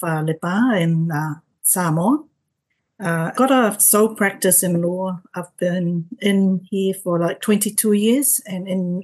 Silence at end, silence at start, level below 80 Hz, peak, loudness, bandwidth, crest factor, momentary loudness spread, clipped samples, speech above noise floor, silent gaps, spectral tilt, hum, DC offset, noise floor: 0 s; 0 s; -70 dBFS; -2 dBFS; -18 LUFS; 13 kHz; 16 dB; 10 LU; under 0.1%; 55 dB; none; -4.5 dB/octave; none; under 0.1%; -74 dBFS